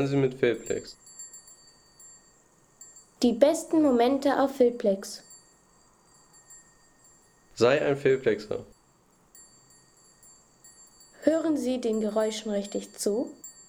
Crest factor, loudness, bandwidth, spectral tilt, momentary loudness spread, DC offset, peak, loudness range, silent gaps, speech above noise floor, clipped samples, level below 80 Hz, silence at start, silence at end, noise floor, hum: 22 dB; -26 LUFS; 18.5 kHz; -5 dB/octave; 21 LU; under 0.1%; -6 dBFS; 7 LU; none; 37 dB; under 0.1%; -64 dBFS; 0 s; 0.15 s; -63 dBFS; none